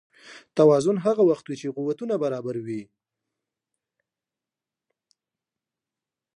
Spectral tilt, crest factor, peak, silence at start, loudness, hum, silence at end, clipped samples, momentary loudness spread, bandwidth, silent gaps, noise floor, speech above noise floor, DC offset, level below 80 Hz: -7 dB/octave; 20 dB; -6 dBFS; 0.25 s; -23 LUFS; none; 3.55 s; under 0.1%; 14 LU; 11.5 kHz; none; -89 dBFS; 67 dB; under 0.1%; -74 dBFS